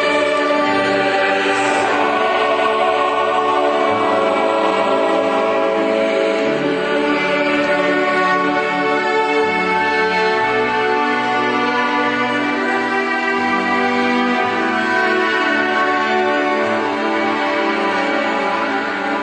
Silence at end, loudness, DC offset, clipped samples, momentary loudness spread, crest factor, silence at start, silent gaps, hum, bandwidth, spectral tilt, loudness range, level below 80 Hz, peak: 0 s; -16 LUFS; under 0.1%; under 0.1%; 2 LU; 14 dB; 0 s; none; none; 9.2 kHz; -4 dB/octave; 1 LU; -58 dBFS; -2 dBFS